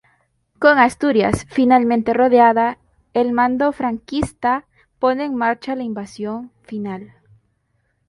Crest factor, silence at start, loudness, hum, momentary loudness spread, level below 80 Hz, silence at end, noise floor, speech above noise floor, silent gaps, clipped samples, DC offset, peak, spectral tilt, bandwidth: 18 dB; 0.6 s; -18 LUFS; none; 15 LU; -48 dBFS; 1.05 s; -67 dBFS; 50 dB; none; under 0.1%; under 0.1%; 0 dBFS; -6 dB/octave; 11.5 kHz